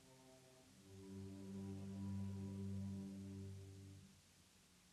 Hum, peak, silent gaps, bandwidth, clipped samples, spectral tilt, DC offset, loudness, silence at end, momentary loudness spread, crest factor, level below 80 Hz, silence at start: none; -40 dBFS; none; 13 kHz; under 0.1%; -7 dB/octave; under 0.1%; -52 LUFS; 0 s; 19 LU; 12 dB; -80 dBFS; 0 s